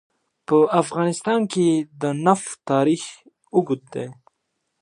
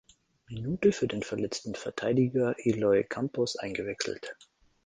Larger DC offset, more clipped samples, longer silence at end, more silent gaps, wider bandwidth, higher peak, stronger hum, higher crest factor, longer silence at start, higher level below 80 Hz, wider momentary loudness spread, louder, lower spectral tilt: neither; neither; first, 0.7 s vs 0.5 s; neither; first, 11.5 kHz vs 9.8 kHz; first, -4 dBFS vs -10 dBFS; neither; about the same, 18 dB vs 20 dB; about the same, 0.5 s vs 0.5 s; second, -72 dBFS vs -62 dBFS; first, 14 LU vs 11 LU; first, -21 LUFS vs -30 LUFS; about the same, -6 dB/octave vs -5.5 dB/octave